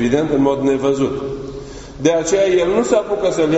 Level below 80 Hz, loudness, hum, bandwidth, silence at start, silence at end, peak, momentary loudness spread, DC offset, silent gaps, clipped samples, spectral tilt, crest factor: -42 dBFS; -16 LUFS; none; 8.2 kHz; 0 s; 0 s; 0 dBFS; 13 LU; under 0.1%; none; under 0.1%; -5.5 dB/octave; 16 dB